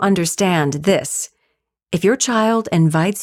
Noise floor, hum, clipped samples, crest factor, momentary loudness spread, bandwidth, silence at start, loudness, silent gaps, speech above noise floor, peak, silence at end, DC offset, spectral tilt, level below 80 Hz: -70 dBFS; none; under 0.1%; 14 dB; 8 LU; 16 kHz; 0 s; -17 LUFS; none; 53 dB; -4 dBFS; 0 s; under 0.1%; -5 dB/octave; -54 dBFS